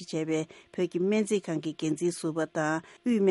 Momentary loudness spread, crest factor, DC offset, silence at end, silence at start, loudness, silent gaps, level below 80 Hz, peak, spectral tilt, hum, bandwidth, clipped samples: 6 LU; 14 dB; under 0.1%; 0 s; 0 s; -30 LUFS; none; -74 dBFS; -14 dBFS; -5.5 dB/octave; none; 11.5 kHz; under 0.1%